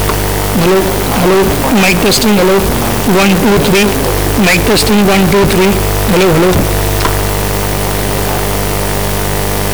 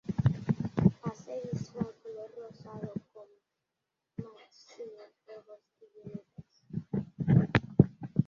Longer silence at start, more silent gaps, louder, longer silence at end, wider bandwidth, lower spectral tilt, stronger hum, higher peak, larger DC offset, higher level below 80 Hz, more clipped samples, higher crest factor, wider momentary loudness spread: about the same, 0 s vs 0.1 s; neither; first, -10 LUFS vs -31 LUFS; about the same, 0 s vs 0.05 s; first, over 20 kHz vs 7 kHz; second, -4.5 dB/octave vs -9 dB/octave; neither; about the same, -6 dBFS vs -6 dBFS; first, 5% vs under 0.1%; first, -20 dBFS vs -54 dBFS; neither; second, 4 dB vs 28 dB; second, 5 LU vs 21 LU